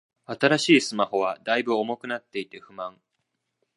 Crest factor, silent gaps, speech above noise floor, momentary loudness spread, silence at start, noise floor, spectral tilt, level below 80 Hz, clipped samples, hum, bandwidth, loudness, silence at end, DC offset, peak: 22 dB; none; 54 dB; 18 LU; 0.3 s; -78 dBFS; -4 dB/octave; -74 dBFS; under 0.1%; none; 11.5 kHz; -24 LUFS; 0.85 s; under 0.1%; -4 dBFS